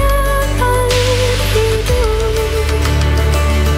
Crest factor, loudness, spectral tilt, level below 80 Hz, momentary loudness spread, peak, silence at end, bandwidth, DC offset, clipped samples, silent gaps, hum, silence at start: 10 dB; -14 LUFS; -4.5 dB/octave; -16 dBFS; 3 LU; -2 dBFS; 0 s; 16.5 kHz; under 0.1%; under 0.1%; none; none; 0 s